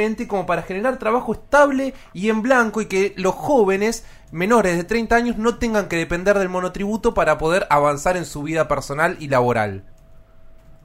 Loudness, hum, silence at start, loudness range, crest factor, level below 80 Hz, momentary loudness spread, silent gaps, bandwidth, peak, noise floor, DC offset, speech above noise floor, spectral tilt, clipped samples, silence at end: -19 LUFS; none; 0 s; 1 LU; 18 dB; -40 dBFS; 8 LU; none; 16 kHz; -2 dBFS; -44 dBFS; under 0.1%; 25 dB; -5.5 dB/octave; under 0.1%; 0.1 s